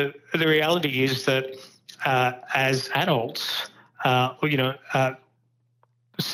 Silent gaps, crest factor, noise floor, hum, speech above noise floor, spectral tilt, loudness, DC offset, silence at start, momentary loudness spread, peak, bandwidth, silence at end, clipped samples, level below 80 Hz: none; 18 dB; -68 dBFS; none; 44 dB; -5 dB/octave; -24 LUFS; under 0.1%; 0 s; 10 LU; -8 dBFS; over 20 kHz; 0 s; under 0.1%; -74 dBFS